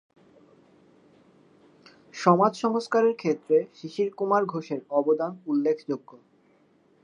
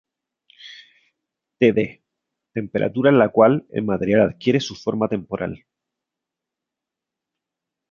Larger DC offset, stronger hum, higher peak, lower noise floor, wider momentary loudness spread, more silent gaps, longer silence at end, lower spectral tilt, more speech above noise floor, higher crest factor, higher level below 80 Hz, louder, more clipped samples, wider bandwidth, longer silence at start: neither; neither; about the same, -4 dBFS vs -2 dBFS; second, -62 dBFS vs -86 dBFS; second, 11 LU vs 16 LU; neither; second, 0.9 s vs 2.35 s; about the same, -6.5 dB/octave vs -7 dB/octave; second, 37 dB vs 67 dB; about the same, 22 dB vs 20 dB; second, -82 dBFS vs -56 dBFS; second, -25 LUFS vs -20 LUFS; neither; first, 10 kHz vs 7.2 kHz; first, 2.15 s vs 0.65 s